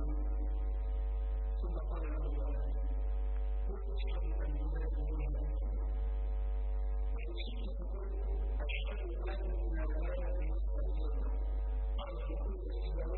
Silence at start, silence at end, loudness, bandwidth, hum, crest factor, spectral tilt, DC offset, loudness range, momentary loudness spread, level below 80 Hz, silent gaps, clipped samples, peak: 0 s; 0 s; -39 LUFS; 4.2 kHz; none; 8 dB; -6.5 dB/octave; under 0.1%; 1 LU; 2 LU; -36 dBFS; none; under 0.1%; -26 dBFS